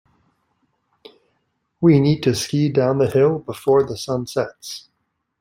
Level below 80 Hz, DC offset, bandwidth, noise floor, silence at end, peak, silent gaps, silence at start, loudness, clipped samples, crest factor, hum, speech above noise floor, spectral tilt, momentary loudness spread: -56 dBFS; under 0.1%; 16 kHz; -73 dBFS; 0.6 s; -2 dBFS; none; 1.8 s; -19 LUFS; under 0.1%; 18 dB; none; 55 dB; -6.5 dB/octave; 12 LU